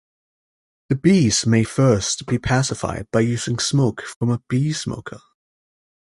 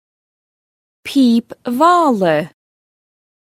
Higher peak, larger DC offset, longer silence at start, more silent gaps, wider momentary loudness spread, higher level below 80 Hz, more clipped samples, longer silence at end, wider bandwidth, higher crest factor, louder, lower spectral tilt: second, -4 dBFS vs 0 dBFS; neither; second, 0.9 s vs 1.05 s; first, 4.16-4.21 s vs none; second, 10 LU vs 14 LU; first, -46 dBFS vs -64 dBFS; neither; second, 0.85 s vs 1.1 s; second, 11.5 kHz vs 15.5 kHz; about the same, 16 dB vs 16 dB; second, -20 LUFS vs -14 LUFS; about the same, -5 dB/octave vs -5.5 dB/octave